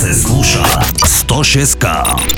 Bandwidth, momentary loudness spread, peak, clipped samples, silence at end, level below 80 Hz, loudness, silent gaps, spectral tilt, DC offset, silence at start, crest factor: over 20 kHz; 3 LU; 0 dBFS; under 0.1%; 0 s; -20 dBFS; -10 LUFS; none; -3 dB/octave; under 0.1%; 0 s; 12 dB